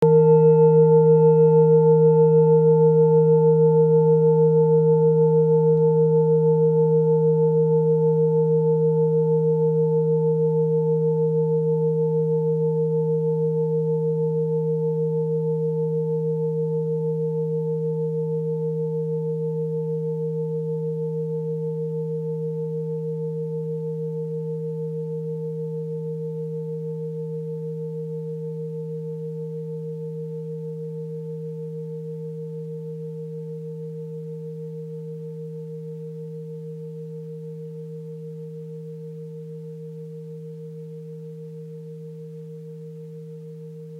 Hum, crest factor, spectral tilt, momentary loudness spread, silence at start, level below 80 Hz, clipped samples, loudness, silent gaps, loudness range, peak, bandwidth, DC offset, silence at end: none; 14 dB; -12.5 dB/octave; 21 LU; 0 s; -74 dBFS; under 0.1%; -21 LUFS; none; 19 LU; -6 dBFS; 1.5 kHz; under 0.1%; 0 s